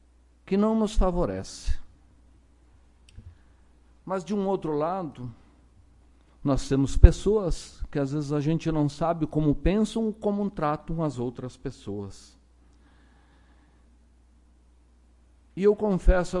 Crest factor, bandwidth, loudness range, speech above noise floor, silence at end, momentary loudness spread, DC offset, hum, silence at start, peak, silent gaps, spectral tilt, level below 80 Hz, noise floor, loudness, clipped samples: 26 dB; 11 kHz; 12 LU; 34 dB; 0 s; 14 LU; under 0.1%; none; 0.45 s; 0 dBFS; none; -7.5 dB/octave; -32 dBFS; -58 dBFS; -27 LUFS; under 0.1%